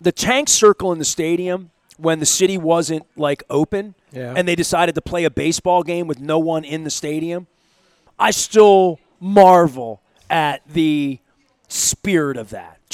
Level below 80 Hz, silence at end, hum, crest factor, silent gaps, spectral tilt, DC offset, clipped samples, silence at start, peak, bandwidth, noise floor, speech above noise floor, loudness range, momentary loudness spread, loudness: -50 dBFS; 0.25 s; none; 18 dB; none; -3.5 dB/octave; under 0.1%; under 0.1%; 0 s; 0 dBFS; 16 kHz; -59 dBFS; 42 dB; 6 LU; 15 LU; -17 LUFS